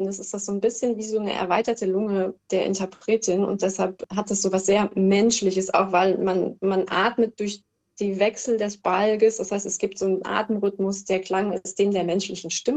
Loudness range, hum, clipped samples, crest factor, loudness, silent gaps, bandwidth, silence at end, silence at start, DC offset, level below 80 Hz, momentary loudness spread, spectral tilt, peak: 3 LU; none; under 0.1%; 18 dB; -24 LUFS; none; 9.2 kHz; 0 s; 0 s; under 0.1%; -62 dBFS; 7 LU; -4.5 dB/octave; -6 dBFS